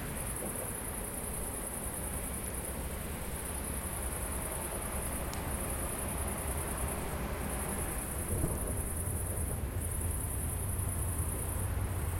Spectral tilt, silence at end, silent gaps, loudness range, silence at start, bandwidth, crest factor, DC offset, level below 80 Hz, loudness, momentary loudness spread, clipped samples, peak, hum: -4.5 dB/octave; 0 s; none; 2 LU; 0 s; 16.5 kHz; 18 dB; under 0.1%; -42 dBFS; -36 LUFS; 3 LU; under 0.1%; -18 dBFS; none